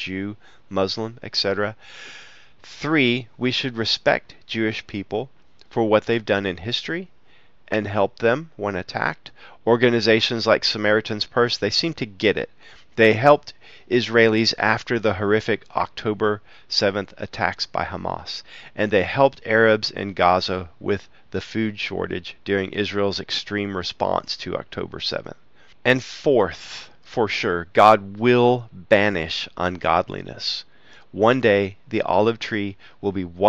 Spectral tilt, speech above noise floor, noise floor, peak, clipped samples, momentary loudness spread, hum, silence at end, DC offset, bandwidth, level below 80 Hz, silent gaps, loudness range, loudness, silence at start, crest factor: -5 dB/octave; 36 dB; -58 dBFS; 0 dBFS; under 0.1%; 13 LU; none; 0 s; 0.4%; 8 kHz; -54 dBFS; none; 6 LU; -21 LUFS; 0 s; 22 dB